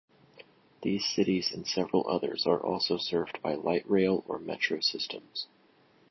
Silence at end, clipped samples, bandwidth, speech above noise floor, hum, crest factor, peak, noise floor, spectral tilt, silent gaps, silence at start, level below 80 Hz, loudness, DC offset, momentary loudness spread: 0.65 s; under 0.1%; 6.2 kHz; 33 dB; none; 20 dB; -12 dBFS; -63 dBFS; -4.5 dB/octave; none; 0.35 s; -66 dBFS; -30 LUFS; under 0.1%; 10 LU